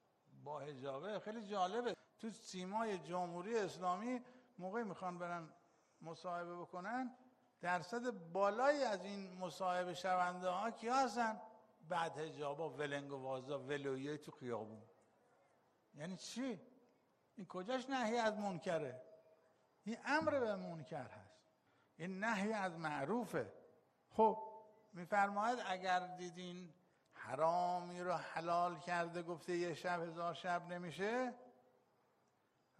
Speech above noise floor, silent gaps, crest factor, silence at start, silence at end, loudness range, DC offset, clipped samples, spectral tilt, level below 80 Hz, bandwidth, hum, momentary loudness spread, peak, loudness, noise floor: 37 dB; none; 22 dB; 0.3 s; 1.3 s; 7 LU; under 0.1%; under 0.1%; -5 dB/octave; -86 dBFS; 11.5 kHz; none; 14 LU; -22 dBFS; -42 LUFS; -79 dBFS